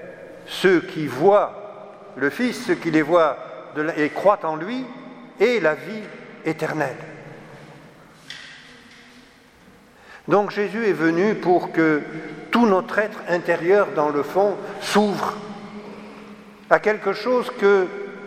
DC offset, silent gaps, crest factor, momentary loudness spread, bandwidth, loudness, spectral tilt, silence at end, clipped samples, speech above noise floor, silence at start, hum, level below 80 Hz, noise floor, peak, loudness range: under 0.1%; none; 22 dB; 21 LU; 15 kHz; -21 LUFS; -5.5 dB/octave; 0 s; under 0.1%; 30 dB; 0 s; none; -66 dBFS; -50 dBFS; 0 dBFS; 11 LU